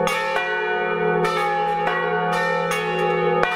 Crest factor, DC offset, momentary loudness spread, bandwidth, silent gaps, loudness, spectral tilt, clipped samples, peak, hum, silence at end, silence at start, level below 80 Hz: 20 dB; under 0.1%; 2 LU; 16 kHz; none; -21 LUFS; -4.5 dB/octave; under 0.1%; 0 dBFS; none; 0 s; 0 s; -56 dBFS